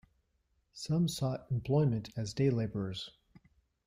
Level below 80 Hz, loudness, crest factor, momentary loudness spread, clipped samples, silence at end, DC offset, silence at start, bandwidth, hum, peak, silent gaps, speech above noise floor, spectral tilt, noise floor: -62 dBFS; -34 LUFS; 16 dB; 11 LU; under 0.1%; 0.75 s; under 0.1%; 0.75 s; 15.5 kHz; none; -18 dBFS; none; 44 dB; -7 dB/octave; -77 dBFS